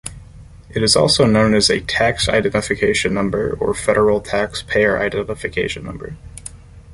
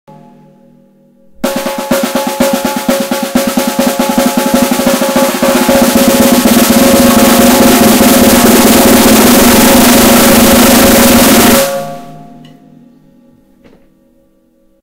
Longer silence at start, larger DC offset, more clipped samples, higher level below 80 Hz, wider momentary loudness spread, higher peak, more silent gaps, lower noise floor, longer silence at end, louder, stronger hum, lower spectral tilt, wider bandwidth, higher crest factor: second, 0.05 s vs 1.4 s; neither; second, under 0.1% vs 2%; second, -38 dBFS vs -30 dBFS; first, 19 LU vs 9 LU; about the same, -2 dBFS vs 0 dBFS; neither; second, -40 dBFS vs -50 dBFS; second, 0 s vs 2.55 s; second, -17 LUFS vs -6 LUFS; neither; about the same, -4 dB/octave vs -3.5 dB/octave; second, 11.5 kHz vs over 20 kHz; first, 16 dB vs 8 dB